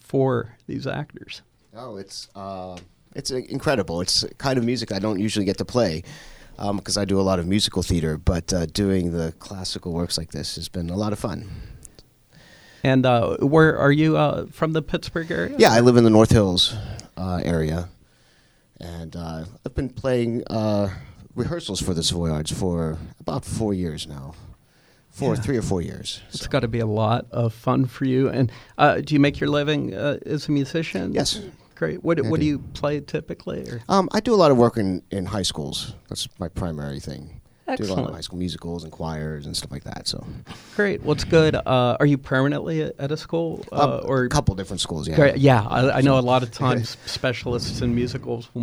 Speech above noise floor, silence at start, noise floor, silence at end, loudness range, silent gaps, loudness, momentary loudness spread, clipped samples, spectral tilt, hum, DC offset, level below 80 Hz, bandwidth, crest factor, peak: 36 dB; 0.15 s; -58 dBFS; 0 s; 10 LU; none; -22 LUFS; 16 LU; under 0.1%; -5.5 dB/octave; none; under 0.1%; -42 dBFS; over 20 kHz; 22 dB; 0 dBFS